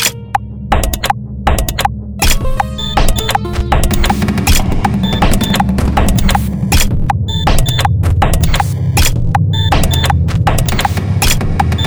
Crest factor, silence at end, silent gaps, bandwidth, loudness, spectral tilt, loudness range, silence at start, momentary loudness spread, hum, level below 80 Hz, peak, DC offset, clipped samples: 12 dB; 0 s; none; over 20 kHz; -14 LUFS; -4.5 dB/octave; 2 LU; 0 s; 4 LU; none; -16 dBFS; 0 dBFS; under 0.1%; under 0.1%